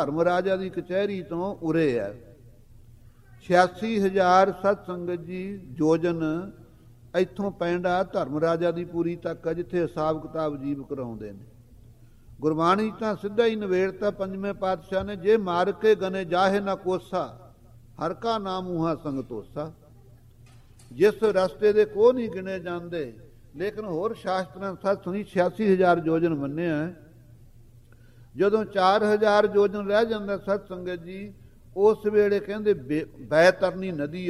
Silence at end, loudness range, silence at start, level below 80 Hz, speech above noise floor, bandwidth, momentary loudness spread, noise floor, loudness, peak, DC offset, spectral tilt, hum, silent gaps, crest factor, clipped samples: 0 s; 6 LU; 0 s; -54 dBFS; 27 dB; 13 kHz; 13 LU; -51 dBFS; -25 LUFS; -4 dBFS; under 0.1%; -6.5 dB/octave; none; none; 22 dB; under 0.1%